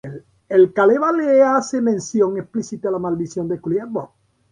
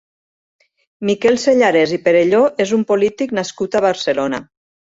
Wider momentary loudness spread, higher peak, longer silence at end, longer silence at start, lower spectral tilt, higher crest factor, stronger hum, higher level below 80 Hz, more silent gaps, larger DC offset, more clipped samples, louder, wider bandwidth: first, 13 LU vs 8 LU; about the same, -4 dBFS vs -2 dBFS; about the same, 0.45 s vs 0.45 s; second, 0.05 s vs 1 s; first, -6.5 dB/octave vs -4.5 dB/octave; about the same, 16 dB vs 14 dB; neither; about the same, -60 dBFS vs -58 dBFS; neither; neither; neither; about the same, -18 LUFS vs -16 LUFS; first, 9.8 kHz vs 8 kHz